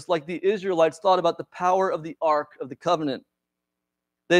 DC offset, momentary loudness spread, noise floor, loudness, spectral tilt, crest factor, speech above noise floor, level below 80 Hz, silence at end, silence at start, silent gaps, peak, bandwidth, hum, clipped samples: under 0.1%; 9 LU; -84 dBFS; -24 LUFS; -5 dB/octave; 18 dB; 60 dB; -72 dBFS; 0 s; 0 s; none; -8 dBFS; 11 kHz; none; under 0.1%